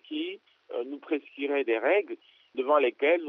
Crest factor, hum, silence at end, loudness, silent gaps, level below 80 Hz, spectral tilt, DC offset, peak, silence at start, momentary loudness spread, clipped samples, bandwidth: 18 dB; none; 0 s; -28 LUFS; none; under -90 dBFS; 1 dB/octave; under 0.1%; -12 dBFS; 0.1 s; 15 LU; under 0.1%; 4.2 kHz